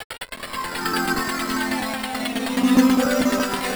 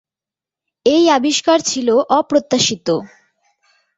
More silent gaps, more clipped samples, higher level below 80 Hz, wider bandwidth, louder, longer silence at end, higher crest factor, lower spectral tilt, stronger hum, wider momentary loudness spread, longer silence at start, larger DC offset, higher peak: first, 0.04-0.10 s vs none; neither; first, -48 dBFS vs -58 dBFS; first, over 20 kHz vs 8.4 kHz; second, -21 LUFS vs -15 LUFS; second, 0 s vs 0.9 s; about the same, 18 dB vs 16 dB; about the same, -3.5 dB/octave vs -3 dB/octave; neither; first, 12 LU vs 7 LU; second, 0 s vs 0.85 s; neither; about the same, -4 dBFS vs -2 dBFS